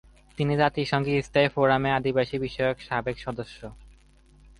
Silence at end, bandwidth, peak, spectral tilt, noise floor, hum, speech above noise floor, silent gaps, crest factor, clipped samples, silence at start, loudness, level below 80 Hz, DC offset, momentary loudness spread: 0.7 s; 11.5 kHz; -8 dBFS; -6.5 dB/octave; -56 dBFS; none; 30 dB; none; 18 dB; under 0.1%; 0.4 s; -25 LUFS; -50 dBFS; under 0.1%; 16 LU